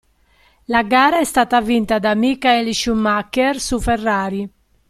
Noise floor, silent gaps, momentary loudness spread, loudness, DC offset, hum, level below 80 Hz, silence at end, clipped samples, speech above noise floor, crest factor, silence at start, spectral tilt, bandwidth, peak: -55 dBFS; none; 7 LU; -17 LUFS; under 0.1%; none; -38 dBFS; 0.4 s; under 0.1%; 39 dB; 16 dB; 0.7 s; -4 dB/octave; 15 kHz; -2 dBFS